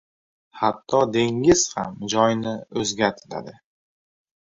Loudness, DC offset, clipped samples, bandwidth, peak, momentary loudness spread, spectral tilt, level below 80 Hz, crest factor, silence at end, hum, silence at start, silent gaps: -22 LUFS; under 0.1%; under 0.1%; 8 kHz; -4 dBFS; 12 LU; -4 dB/octave; -54 dBFS; 20 dB; 1 s; none; 0.55 s; none